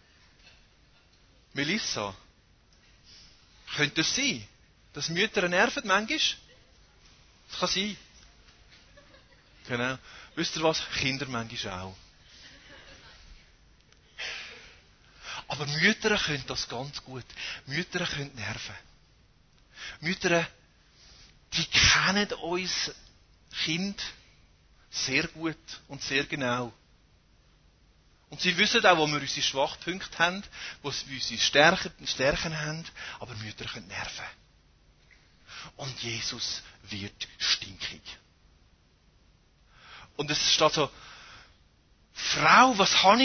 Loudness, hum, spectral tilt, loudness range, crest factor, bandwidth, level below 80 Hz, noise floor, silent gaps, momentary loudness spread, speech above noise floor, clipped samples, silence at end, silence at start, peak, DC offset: -27 LUFS; none; -2.5 dB/octave; 10 LU; 26 dB; 6.6 kHz; -54 dBFS; -63 dBFS; none; 20 LU; 34 dB; under 0.1%; 0 s; 1.55 s; -4 dBFS; under 0.1%